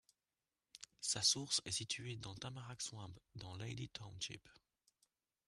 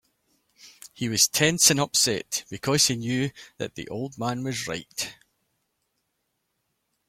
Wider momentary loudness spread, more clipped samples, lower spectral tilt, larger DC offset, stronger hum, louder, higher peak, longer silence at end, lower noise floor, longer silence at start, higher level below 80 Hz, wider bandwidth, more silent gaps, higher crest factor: first, 20 LU vs 16 LU; neither; about the same, -2 dB/octave vs -2.5 dB/octave; neither; neither; second, -41 LUFS vs -23 LUFS; second, -22 dBFS vs -2 dBFS; second, 0.95 s vs 1.95 s; first, under -90 dBFS vs -77 dBFS; about the same, 0.75 s vs 0.65 s; second, -74 dBFS vs -62 dBFS; second, 13 kHz vs 16.5 kHz; neither; about the same, 24 dB vs 26 dB